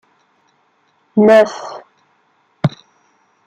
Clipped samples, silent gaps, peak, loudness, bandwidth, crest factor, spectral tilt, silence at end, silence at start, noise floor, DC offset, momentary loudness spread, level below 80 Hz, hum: under 0.1%; none; -2 dBFS; -14 LUFS; 10.5 kHz; 16 dB; -7 dB/octave; 0.8 s; 1.15 s; -59 dBFS; under 0.1%; 22 LU; -60 dBFS; none